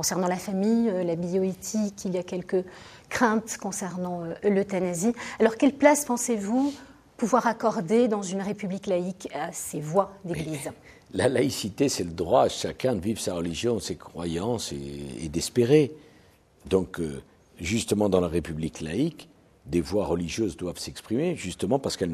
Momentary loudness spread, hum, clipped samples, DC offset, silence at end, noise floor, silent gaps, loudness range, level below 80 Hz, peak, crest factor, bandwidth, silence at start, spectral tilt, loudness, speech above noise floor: 11 LU; none; under 0.1%; under 0.1%; 0 s; -57 dBFS; none; 4 LU; -52 dBFS; -4 dBFS; 22 dB; 15 kHz; 0 s; -5 dB/octave; -27 LUFS; 31 dB